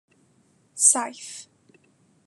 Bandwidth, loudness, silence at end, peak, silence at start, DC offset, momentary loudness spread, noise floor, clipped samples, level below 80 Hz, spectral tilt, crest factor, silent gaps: 12.5 kHz; -19 LUFS; 0.85 s; -4 dBFS; 0.75 s; under 0.1%; 24 LU; -63 dBFS; under 0.1%; -88 dBFS; 0.5 dB/octave; 26 dB; none